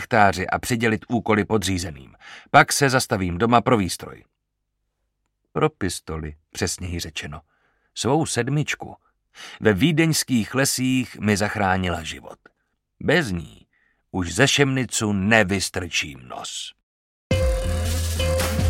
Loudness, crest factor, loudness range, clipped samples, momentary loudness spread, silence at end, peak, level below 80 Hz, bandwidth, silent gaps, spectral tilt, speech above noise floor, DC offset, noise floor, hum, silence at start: -22 LUFS; 22 dB; 7 LU; under 0.1%; 15 LU; 0 s; 0 dBFS; -38 dBFS; 16.5 kHz; 16.83-17.30 s; -4.5 dB/octave; 55 dB; under 0.1%; -77 dBFS; none; 0 s